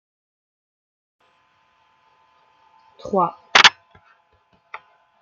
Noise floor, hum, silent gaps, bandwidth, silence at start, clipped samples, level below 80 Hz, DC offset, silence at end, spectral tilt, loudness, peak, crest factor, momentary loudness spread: -62 dBFS; none; none; 9.4 kHz; 3.05 s; under 0.1%; -66 dBFS; under 0.1%; 1.5 s; -1 dB/octave; -15 LUFS; 0 dBFS; 24 dB; 29 LU